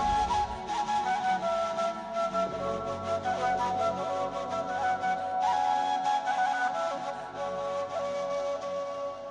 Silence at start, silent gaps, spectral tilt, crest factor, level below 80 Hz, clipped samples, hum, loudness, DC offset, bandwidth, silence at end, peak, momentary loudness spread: 0 s; none; -4 dB/octave; 12 dB; -52 dBFS; under 0.1%; none; -30 LUFS; under 0.1%; 10.5 kHz; 0 s; -18 dBFS; 6 LU